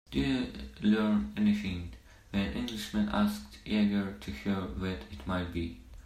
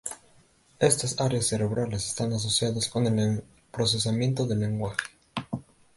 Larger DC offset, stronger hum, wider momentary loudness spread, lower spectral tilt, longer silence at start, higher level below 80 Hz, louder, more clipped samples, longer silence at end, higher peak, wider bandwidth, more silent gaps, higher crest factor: neither; neither; second, 10 LU vs 13 LU; first, -6.5 dB/octave vs -4.5 dB/octave; about the same, 0.1 s vs 0.05 s; first, -48 dBFS vs -54 dBFS; second, -32 LUFS vs -27 LUFS; neither; second, 0.05 s vs 0.35 s; second, -16 dBFS vs -6 dBFS; first, 14.5 kHz vs 12 kHz; neither; second, 16 dB vs 22 dB